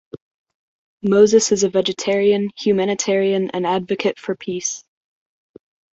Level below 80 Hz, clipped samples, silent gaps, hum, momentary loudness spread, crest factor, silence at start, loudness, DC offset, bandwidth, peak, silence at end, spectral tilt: -62 dBFS; under 0.1%; 0.21-0.46 s, 0.54-0.98 s; none; 12 LU; 18 dB; 0.15 s; -18 LUFS; under 0.1%; 8.2 kHz; -2 dBFS; 1.15 s; -4 dB/octave